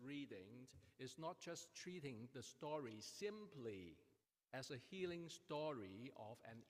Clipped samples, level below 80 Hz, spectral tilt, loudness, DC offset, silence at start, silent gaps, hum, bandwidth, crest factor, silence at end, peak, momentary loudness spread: under 0.1%; -88 dBFS; -4.5 dB/octave; -53 LUFS; under 0.1%; 0 s; none; none; 15.5 kHz; 18 dB; 0 s; -36 dBFS; 9 LU